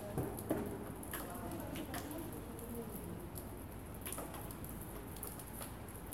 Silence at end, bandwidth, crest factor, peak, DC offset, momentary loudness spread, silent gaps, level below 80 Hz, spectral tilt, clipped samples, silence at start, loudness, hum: 0 s; 17 kHz; 22 dB; -22 dBFS; under 0.1%; 7 LU; none; -56 dBFS; -5 dB/octave; under 0.1%; 0 s; -45 LUFS; none